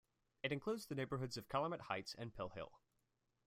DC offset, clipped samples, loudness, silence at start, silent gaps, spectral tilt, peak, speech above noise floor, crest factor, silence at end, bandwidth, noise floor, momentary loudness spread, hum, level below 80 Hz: under 0.1%; under 0.1%; -45 LUFS; 0.45 s; none; -5.5 dB/octave; -26 dBFS; 40 dB; 20 dB; 0.7 s; 16 kHz; -85 dBFS; 8 LU; none; -72 dBFS